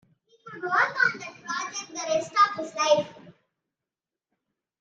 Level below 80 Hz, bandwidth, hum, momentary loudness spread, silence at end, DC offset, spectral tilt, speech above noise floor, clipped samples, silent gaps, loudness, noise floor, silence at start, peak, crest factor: -78 dBFS; 8.8 kHz; none; 15 LU; 1.5 s; under 0.1%; -2 dB/octave; 65 dB; under 0.1%; none; -25 LUFS; -90 dBFS; 0.45 s; -8 dBFS; 20 dB